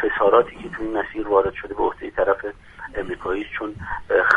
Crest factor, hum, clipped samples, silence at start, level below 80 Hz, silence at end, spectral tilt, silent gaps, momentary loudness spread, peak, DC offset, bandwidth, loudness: 22 dB; none; under 0.1%; 0 s; -44 dBFS; 0 s; -6.5 dB/octave; none; 14 LU; 0 dBFS; under 0.1%; 9.4 kHz; -23 LUFS